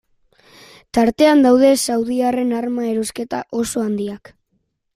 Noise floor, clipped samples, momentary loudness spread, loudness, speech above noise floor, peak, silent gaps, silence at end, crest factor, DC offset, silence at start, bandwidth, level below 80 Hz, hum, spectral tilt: -69 dBFS; under 0.1%; 13 LU; -17 LUFS; 52 dB; -2 dBFS; none; 0.8 s; 16 dB; under 0.1%; 0.95 s; 16 kHz; -52 dBFS; none; -4 dB/octave